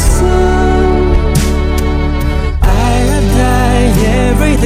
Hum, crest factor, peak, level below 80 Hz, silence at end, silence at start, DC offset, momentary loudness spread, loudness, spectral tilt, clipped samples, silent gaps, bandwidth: none; 10 dB; 0 dBFS; -12 dBFS; 0 s; 0 s; under 0.1%; 4 LU; -11 LUFS; -6 dB/octave; 0.4%; none; 15.5 kHz